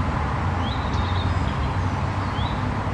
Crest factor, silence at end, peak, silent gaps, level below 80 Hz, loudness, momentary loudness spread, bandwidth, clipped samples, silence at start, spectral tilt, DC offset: 12 dB; 0 s; -12 dBFS; none; -32 dBFS; -25 LUFS; 2 LU; 9.6 kHz; under 0.1%; 0 s; -7 dB/octave; under 0.1%